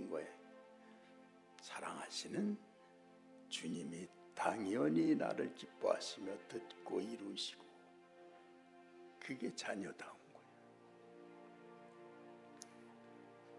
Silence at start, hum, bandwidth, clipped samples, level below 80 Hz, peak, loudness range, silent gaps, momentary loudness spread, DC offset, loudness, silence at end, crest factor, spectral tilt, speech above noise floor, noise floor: 0 s; none; 11.5 kHz; under 0.1%; under -90 dBFS; -22 dBFS; 11 LU; none; 24 LU; under 0.1%; -43 LUFS; 0 s; 24 dB; -4.5 dB/octave; 23 dB; -65 dBFS